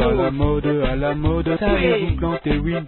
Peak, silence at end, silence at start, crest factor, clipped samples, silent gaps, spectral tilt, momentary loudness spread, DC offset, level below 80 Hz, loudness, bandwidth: -4 dBFS; 0 s; 0 s; 14 dB; under 0.1%; none; -12 dB/octave; 3 LU; 0.4%; -28 dBFS; -20 LUFS; 4.3 kHz